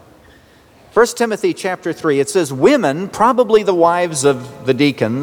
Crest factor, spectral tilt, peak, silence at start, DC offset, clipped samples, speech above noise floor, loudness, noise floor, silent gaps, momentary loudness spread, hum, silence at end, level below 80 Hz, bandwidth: 14 dB; -5 dB/octave; -2 dBFS; 0.95 s; under 0.1%; under 0.1%; 32 dB; -15 LUFS; -47 dBFS; none; 7 LU; none; 0 s; -54 dBFS; 19.5 kHz